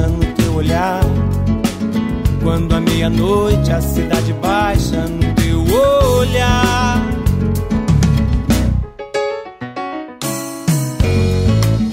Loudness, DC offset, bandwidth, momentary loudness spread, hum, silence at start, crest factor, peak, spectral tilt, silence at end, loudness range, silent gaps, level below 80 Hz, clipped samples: -16 LUFS; under 0.1%; 16.5 kHz; 8 LU; none; 0 s; 12 dB; -2 dBFS; -6 dB/octave; 0 s; 4 LU; none; -22 dBFS; under 0.1%